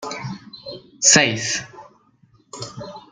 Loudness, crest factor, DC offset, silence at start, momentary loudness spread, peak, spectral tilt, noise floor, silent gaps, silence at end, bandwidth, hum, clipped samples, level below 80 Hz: -16 LUFS; 22 dB; under 0.1%; 0 s; 24 LU; 0 dBFS; -1.5 dB/octave; -57 dBFS; none; 0.1 s; 11.5 kHz; none; under 0.1%; -60 dBFS